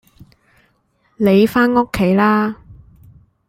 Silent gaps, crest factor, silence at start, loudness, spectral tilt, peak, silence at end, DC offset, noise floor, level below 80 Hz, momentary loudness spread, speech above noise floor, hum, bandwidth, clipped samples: none; 16 dB; 1.2 s; -15 LUFS; -7 dB/octave; -2 dBFS; 0.75 s; under 0.1%; -61 dBFS; -46 dBFS; 8 LU; 48 dB; none; 16 kHz; under 0.1%